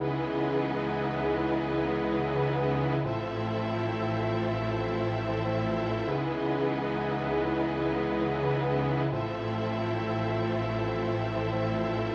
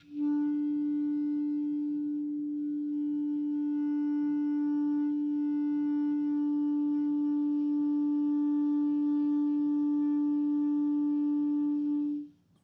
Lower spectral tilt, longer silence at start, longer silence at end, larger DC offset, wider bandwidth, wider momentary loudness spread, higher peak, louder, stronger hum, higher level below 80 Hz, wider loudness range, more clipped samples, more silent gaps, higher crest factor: about the same, -8.5 dB/octave vs -9 dB/octave; about the same, 0 s vs 0.1 s; second, 0 s vs 0.35 s; neither; first, 7 kHz vs 3.1 kHz; about the same, 3 LU vs 4 LU; first, -16 dBFS vs -24 dBFS; about the same, -29 LUFS vs -30 LUFS; neither; first, -50 dBFS vs -84 dBFS; about the same, 1 LU vs 3 LU; neither; neither; first, 12 dB vs 6 dB